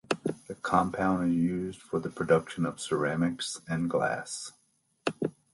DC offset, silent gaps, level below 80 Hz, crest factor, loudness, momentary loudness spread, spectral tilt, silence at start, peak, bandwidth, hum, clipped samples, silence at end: under 0.1%; none; -60 dBFS; 20 dB; -30 LUFS; 9 LU; -5.5 dB/octave; 0.1 s; -10 dBFS; 11.5 kHz; none; under 0.1%; 0.25 s